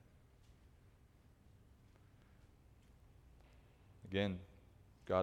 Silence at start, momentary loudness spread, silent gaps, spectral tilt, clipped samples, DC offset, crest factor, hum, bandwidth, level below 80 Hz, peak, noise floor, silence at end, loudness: 4.05 s; 28 LU; none; -7 dB/octave; under 0.1%; under 0.1%; 26 dB; none; 14 kHz; -68 dBFS; -22 dBFS; -67 dBFS; 0 s; -42 LUFS